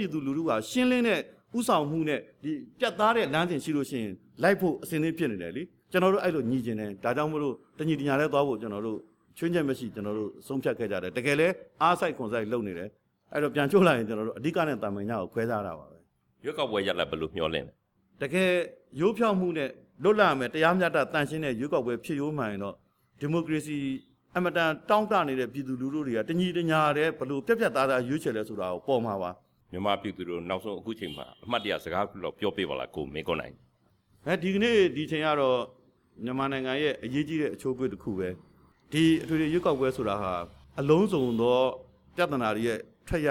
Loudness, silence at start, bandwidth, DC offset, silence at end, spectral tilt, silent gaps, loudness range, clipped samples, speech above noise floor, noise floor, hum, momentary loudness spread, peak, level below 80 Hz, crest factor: -28 LUFS; 0 s; 17.5 kHz; under 0.1%; 0 s; -6 dB/octave; none; 5 LU; under 0.1%; 39 dB; -67 dBFS; none; 12 LU; -10 dBFS; -60 dBFS; 20 dB